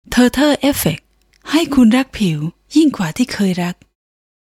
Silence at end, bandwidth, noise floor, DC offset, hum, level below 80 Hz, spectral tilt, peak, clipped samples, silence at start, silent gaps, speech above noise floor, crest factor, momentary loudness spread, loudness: 0.75 s; 17 kHz; -33 dBFS; under 0.1%; none; -42 dBFS; -5 dB/octave; -2 dBFS; under 0.1%; 0.1 s; none; 19 dB; 14 dB; 11 LU; -15 LUFS